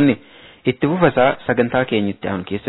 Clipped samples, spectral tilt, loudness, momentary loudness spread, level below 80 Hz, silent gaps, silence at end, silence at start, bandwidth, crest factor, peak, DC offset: under 0.1%; -10.5 dB/octave; -18 LUFS; 9 LU; -50 dBFS; none; 0 s; 0 s; 4.1 kHz; 16 dB; -2 dBFS; under 0.1%